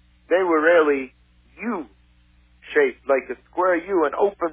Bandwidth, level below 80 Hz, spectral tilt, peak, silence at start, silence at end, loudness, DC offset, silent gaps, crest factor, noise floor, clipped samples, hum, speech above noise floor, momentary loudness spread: 3.7 kHz; -58 dBFS; -8.5 dB/octave; -4 dBFS; 0.3 s; 0 s; -21 LUFS; under 0.1%; none; 18 dB; -56 dBFS; under 0.1%; 60 Hz at -60 dBFS; 36 dB; 14 LU